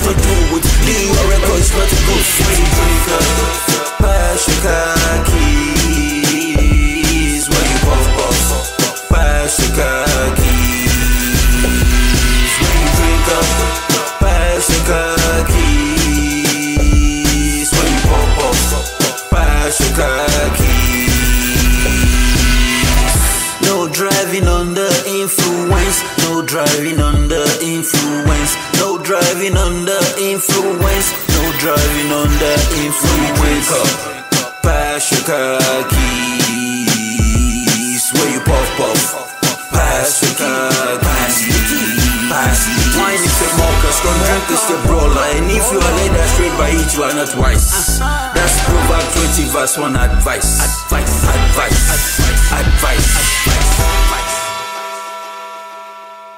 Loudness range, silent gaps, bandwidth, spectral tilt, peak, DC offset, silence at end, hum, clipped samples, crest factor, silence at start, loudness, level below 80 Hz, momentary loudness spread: 2 LU; none; 16.5 kHz; -3.5 dB/octave; 0 dBFS; under 0.1%; 0 s; none; under 0.1%; 12 dB; 0 s; -13 LUFS; -16 dBFS; 3 LU